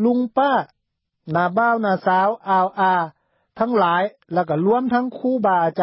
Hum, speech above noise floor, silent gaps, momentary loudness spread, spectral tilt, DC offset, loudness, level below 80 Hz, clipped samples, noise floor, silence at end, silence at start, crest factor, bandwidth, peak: none; 53 dB; none; 6 LU; -11.5 dB/octave; under 0.1%; -19 LUFS; -66 dBFS; under 0.1%; -72 dBFS; 0 s; 0 s; 14 dB; 5.8 kHz; -6 dBFS